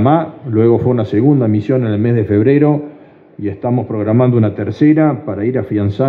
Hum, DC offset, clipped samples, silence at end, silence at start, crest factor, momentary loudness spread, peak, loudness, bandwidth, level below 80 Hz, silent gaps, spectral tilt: none; under 0.1%; under 0.1%; 0 s; 0 s; 12 dB; 7 LU; 0 dBFS; -14 LUFS; 5 kHz; -54 dBFS; none; -11 dB/octave